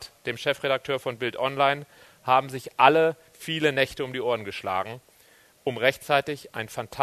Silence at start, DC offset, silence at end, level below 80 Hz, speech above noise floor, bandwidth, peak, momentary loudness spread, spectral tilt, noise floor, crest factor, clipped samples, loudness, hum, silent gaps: 0 s; under 0.1%; 0 s; -64 dBFS; 32 dB; 13.5 kHz; -2 dBFS; 14 LU; -4.5 dB/octave; -57 dBFS; 24 dB; under 0.1%; -25 LUFS; none; none